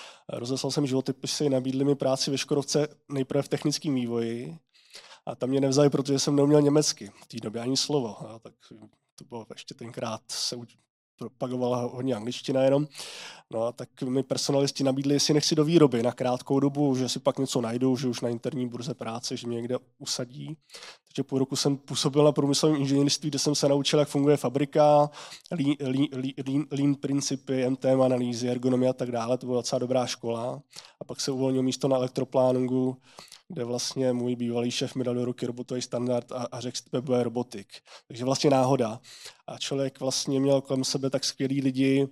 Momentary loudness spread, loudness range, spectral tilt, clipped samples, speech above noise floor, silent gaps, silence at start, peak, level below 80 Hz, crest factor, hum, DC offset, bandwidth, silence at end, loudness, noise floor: 16 LU; 7 LU; -5 dB/octave; under 0.1%; 24 dB; 9.12-9.17 s, 10.90-11.18 s; 0 s; -6 dBFS; -76 dBFS; 20 dB; none; under 0.1%; 14.5 kHz; 0 s; -27 LUFS; -51 dBFS